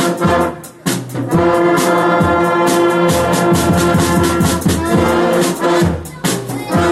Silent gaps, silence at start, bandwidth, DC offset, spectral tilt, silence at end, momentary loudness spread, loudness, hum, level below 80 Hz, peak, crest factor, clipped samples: none; 0 s; 16 kHz; under 0.1%; -5.5 dB/octave; 0 s; 7 LU; -14 LUFS; none; -34 dBFS; -2 dBFS; 10 dB; under 0.1%